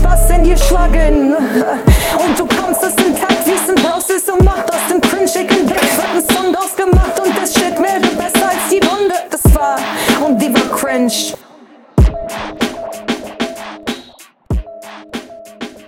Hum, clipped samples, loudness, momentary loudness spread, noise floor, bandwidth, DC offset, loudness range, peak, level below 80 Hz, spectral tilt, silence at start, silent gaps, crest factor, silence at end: none; under 0.1%; -13 LUFS; 12 LU; -41 dBFS; 17.5 kHz; under 0.1%; 7 LU; 0 dBFS; -18 dBFS; -4.5 dB/octave; 0 s; none; 12 dB; 0.05 s